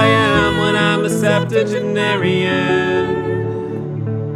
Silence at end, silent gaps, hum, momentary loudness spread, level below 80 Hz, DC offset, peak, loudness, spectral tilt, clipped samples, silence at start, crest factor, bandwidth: 0 s; none; none; 9 LU; -42 dBFS; under 0.1%; 0 dBFS; -16 LUFS; -5.5 dB/octave; under 0.1%; 0 s; 16 dB; 14 kHz